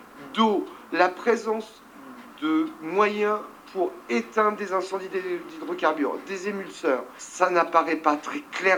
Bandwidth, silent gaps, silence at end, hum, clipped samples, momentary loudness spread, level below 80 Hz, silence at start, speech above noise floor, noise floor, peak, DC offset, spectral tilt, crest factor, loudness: 20 kHz; none; 0 s; none; under 0.1%; 10 LU; -72 dBFS; 0 s; 19 dB; -44 dBFS; -4 dBFS; under 0.1%; -4 dB/octave; 22 dB; -26 LUFS